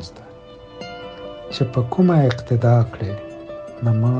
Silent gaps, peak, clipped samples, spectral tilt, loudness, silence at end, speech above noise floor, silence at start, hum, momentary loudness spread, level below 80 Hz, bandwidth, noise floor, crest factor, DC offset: none; -4 dBFS; under 0.1%; -8.5 dB/octave; -19 LUFS; 0 s; 23 dB; 0 s; none; 22 LU; -50 dBFS; 7.2 kHz; -41 dBFS; 16 dB; under 0.1%